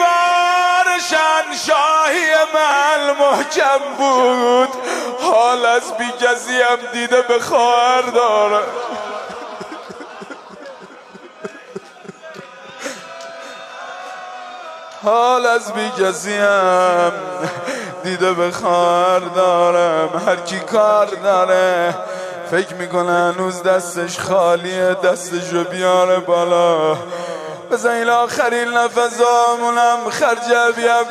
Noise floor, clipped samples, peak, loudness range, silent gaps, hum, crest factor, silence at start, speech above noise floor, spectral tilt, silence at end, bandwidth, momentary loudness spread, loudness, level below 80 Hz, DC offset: -39 dBFS; under 0.1%; -2 dBFS; 17 LU; none; none; 14 dB; 0 s; 24 dB; -3 dB/octave; 0 s; 14 kHz; 18 LU; -15 LUFS; -68 dBFS; under 0.1%